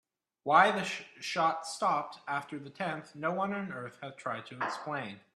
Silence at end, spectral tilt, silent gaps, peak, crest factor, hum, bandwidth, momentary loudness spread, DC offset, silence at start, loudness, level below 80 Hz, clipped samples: 0.15 s; -4 dB/octave; none; -10 dBFS; 24 dB; none; 13 kHz; 15 LU; under 0.1%; 0.45 s; -32 LUFS; -80 dBFS; under 0.1%